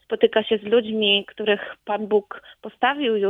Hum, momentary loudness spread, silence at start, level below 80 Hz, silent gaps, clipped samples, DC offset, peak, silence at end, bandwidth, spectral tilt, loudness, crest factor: none; 11 LU; 0.1 s; -66 dBFS; none; under 0.1%; under 0.1%; -4 dBFS; 0 s; 3.9 kHz; -6.5 dB/octave; -21 LUFS; 18 dB